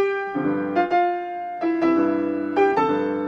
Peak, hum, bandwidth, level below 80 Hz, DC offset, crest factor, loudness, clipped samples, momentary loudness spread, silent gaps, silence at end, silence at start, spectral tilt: -8 dBFS; none; 6.6 kHz; -62 dBFS; under 0.1%; 14 dB; -22 LUFS; under 0.1%; 6 LU; none; 0 s; 0 s; -7.5 dB/octave